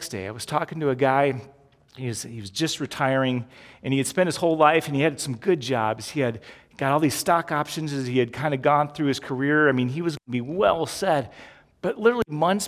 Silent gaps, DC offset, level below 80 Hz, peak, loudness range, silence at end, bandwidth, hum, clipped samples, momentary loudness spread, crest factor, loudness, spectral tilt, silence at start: none; under 0.1%; -58 dBFS; -4 dBFS; 3 LU; 0 s; 16 kHz; none; under 0.1%; 12 LU; 20 dB; -24 LUFS; -5 dB/octave; 0 s